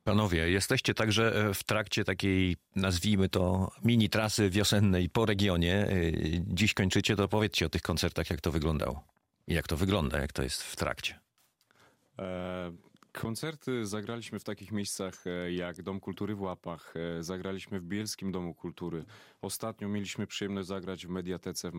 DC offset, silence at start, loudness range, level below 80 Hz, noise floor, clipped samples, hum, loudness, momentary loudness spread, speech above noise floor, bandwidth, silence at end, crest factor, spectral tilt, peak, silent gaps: under 0.1%; 0.05 s; 10 LU; -50 dBFS; -72 dBFS; under 0.1%; none; -31 LUFS; 12 LU; 41 dB; 16 kHz; 0 s; 18 dB; -5 dB/octave; -14 dBFS; none